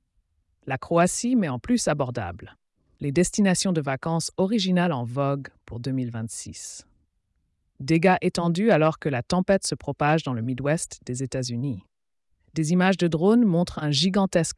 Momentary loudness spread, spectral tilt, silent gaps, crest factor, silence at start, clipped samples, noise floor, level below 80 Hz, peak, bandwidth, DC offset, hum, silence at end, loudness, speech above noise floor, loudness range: 14 LU; -5.5 dB/octave; none; 16 dB; 0.65 s; under 0.1%; -75 dBFS; -54 dBFS; -8 dBFS; 12 kHz; under 0.1%; none; 0 s; -24 LUFS; 51 dB; 4 LU